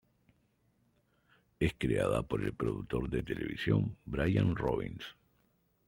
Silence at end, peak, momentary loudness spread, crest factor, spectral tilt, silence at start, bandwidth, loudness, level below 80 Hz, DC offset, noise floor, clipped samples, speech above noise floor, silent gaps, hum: 0.75 s; -14 dBFS; 7 LU; 20 dB; -7.5 dB/octave; 1.6 s; 16.5 kHz; -34 LUFS; -50 dBFS; under 0.1%; -73 dBFS; under 0.1%; 41 dB; none; none